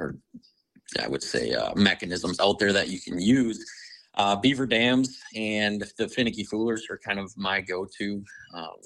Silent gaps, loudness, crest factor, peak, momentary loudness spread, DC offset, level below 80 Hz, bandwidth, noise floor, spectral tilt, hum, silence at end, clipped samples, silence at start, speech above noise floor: none; -26 LUFS; 22 dB; -6 dBFS; 14 LU; under 0.1%; -58 dBFS; 11.5 kHz; -61 dBFS; -4.5 dB/octave; none; 0.1 s; under 0.1%; 0 s; 35 dB